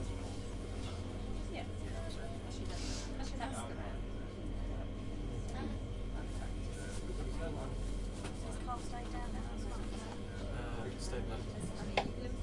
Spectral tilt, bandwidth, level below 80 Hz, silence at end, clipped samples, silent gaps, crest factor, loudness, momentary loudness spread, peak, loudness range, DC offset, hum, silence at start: -5.5 dB/octave; 11.5 kHz; -44 dBFS; 0 s; under 0.1%; none; 26 dB; -43 LUFS; 3 LU; -14 dBFS; 1 LU; under 0.1%; none; 0 s